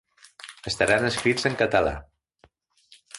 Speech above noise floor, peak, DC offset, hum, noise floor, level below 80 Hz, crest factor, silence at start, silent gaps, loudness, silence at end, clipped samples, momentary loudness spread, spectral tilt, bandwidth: 39 dB; -6 dBFS; under 0.1%; none; -62 dBFS; -48 dBFS; 20 dB; 0.45 s; none; -23 LUFS; 0 s; under 0.1%; 19 LU; -4 dB/octave; 11.5 kHz